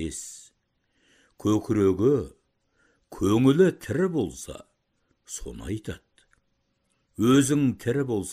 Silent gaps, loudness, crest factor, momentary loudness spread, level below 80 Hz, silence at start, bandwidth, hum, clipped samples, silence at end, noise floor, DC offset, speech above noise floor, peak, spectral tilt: none; -24 LUFS; 18 dB; 21 LU; -52 dBFS; 0 s; 15.5 kHz; none; under 0.1%; 0 s; -73 dBFS; under 0.1%; 49 dB; -8 dBFS; -6 dB/octave